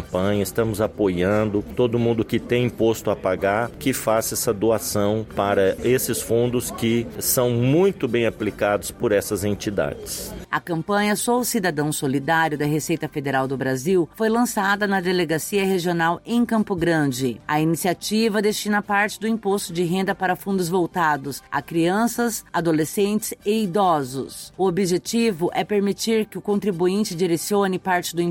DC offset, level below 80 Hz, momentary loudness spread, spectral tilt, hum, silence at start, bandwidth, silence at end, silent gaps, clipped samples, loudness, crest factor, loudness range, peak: under 0.1%; -50 dBFS; 4 LU; -5 dB/octave; none; 0 s; 17 kHz; 0 s; none; under 0.1%; -22 LUFS; 16 dB; 2 LU; -6 dBFS